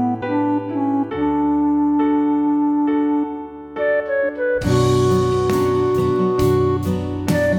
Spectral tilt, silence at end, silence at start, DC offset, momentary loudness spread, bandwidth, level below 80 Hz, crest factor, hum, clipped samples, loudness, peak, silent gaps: -7 dB/octave; 0 s; 0 s; under 0.1%; 5 LU; 17.5 kHz; -42 dBFS; 12 dB; none; under 0.1%; -18 LUFS; -6 dBFS; none